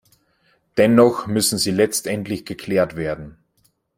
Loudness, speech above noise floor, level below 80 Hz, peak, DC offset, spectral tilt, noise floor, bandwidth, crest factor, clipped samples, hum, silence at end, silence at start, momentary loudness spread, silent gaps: -19 LUFS; 46 dB; -54 dBFS; 0 dBFS; under 0.1%; -4.5 dB/octave; -64 dBFS; 16.5 kHz; 20 dB; under 0.1%; none; 0.65 s; 0.75 s; 13 LU; none